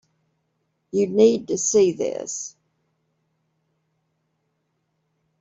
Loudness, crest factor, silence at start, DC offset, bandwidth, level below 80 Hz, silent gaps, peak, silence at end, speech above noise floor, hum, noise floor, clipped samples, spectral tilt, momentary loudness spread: -21 LUFS; 20 dB; 0.95 s; under 0.1%; 8 kHz; -68 dBFS; none; -4 dBFS; 2.9 s; 53 dB; none; -73 dBFS; under 0.1%; -4.5 dB/octave; 13 LU